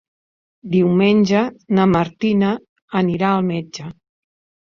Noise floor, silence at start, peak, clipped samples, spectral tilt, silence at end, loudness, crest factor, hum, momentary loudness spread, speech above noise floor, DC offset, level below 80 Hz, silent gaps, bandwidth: under -90 dBFS; 0.65 s; -2 dBFS; under 0.1%; -7.5 dB/octave; 0.75 s; -18 LUFS; 16 dB; none; 13 LU; over 73 dB; under 0.1%; -54 dBFS; 2.69-2.76 s, 2.82-2.88 s; 7.2 kHz